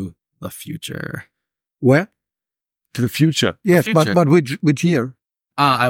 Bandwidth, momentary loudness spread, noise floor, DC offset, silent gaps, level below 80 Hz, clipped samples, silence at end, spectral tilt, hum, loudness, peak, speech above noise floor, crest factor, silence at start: 17 kHz; 18 LU; -88 dBFS; under 0.1%; none; -58 dBFS; under 0.1%; 0 s; -6 dB/octave; none; -17 LUFS; -2 dBFS; 72 dB; 18 dB; 0 s